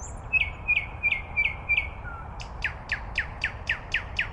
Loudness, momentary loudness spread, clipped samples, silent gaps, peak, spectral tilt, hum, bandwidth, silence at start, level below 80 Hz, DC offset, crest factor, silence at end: -27 LUFS; 12 LU; under 0.1%; none; -14 dBFS; -3 dB/octave; none; 11 kHz; 0 s; -40 dBFS; under 0.1%; 16 dB; 0 s